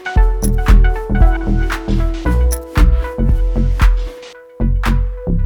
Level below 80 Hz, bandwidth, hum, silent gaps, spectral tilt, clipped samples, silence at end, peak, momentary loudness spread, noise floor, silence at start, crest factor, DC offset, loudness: -14 dBFS; 16 kHz; none; none; -6.5 dB/octave; under 0.1%; 0 s; 0 dBFS; 7 LU; -35 dBFS; 0 s; 12 dB; under 0.1%; -16 LUFS